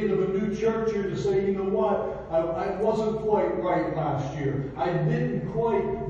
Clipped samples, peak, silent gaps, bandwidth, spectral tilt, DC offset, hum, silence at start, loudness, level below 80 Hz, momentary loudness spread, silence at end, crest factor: under 0.1%; -10 dBFS; none; 7.8 kHz; -8 dB/octave; under 0.1%; none; 0 s; -26 LUFS; -48 dBFS; 4 LU; 0 s; 16 dB